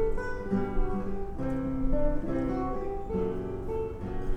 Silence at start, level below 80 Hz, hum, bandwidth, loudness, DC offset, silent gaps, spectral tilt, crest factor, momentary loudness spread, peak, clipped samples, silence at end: 0 s; -34 dBFS; none; 5.8 kHz; -33 LUFS; under 0.1%; none; -9 dB/octave; 14 dB; 5 LU; -14 dBFS; under 0.1%; 0 s